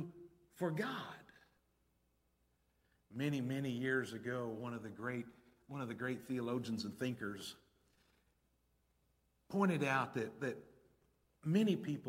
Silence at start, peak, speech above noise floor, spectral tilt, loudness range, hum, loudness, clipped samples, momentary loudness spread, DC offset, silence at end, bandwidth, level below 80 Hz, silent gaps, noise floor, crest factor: 0 s; -20 dBFS; 40 dB; -6.5 dB/octave; 5 LU; none; -40 LUFS; under 0.1%; 16 LU; under 0.1%; 0 s; 16.5 kHz; -78 dBFS; none; -79 dBFS; 22 dB